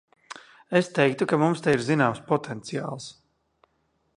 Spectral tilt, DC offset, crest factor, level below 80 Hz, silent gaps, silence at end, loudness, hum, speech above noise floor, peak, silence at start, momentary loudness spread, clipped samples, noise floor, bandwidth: -6 dB/octave; under 0.1%; 22 dB; -66 dBFS; none; 1.05 s; -25 LUFS; none; 47 dB; -4 dBFS; 0.3 s; 22 LU; under 0.1%; -71 dBFS; 11.5 kHz